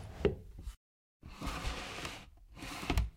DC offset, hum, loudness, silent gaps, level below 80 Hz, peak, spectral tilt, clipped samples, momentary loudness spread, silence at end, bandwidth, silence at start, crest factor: under 0.1%; none; -41 LUFS; 0.77-1.20 s; -44 dBFS; -14 dBFS; -5 dB/octave; under 0.1%; 18 LU; 0 s; 16 kHz; 0 s; 26 dB